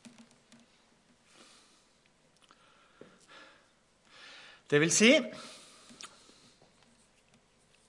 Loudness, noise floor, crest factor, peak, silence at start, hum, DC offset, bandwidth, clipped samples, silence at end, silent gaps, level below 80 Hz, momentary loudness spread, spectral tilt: -25 LUFS; -67 dBFS; 26 dB; -10 dBFS; 4.7 s; none; under 0.1%; 11.5 kHz; under 0.1%; 1.8 s; none; -82 dBFS; 31 LU; -3 dB/octave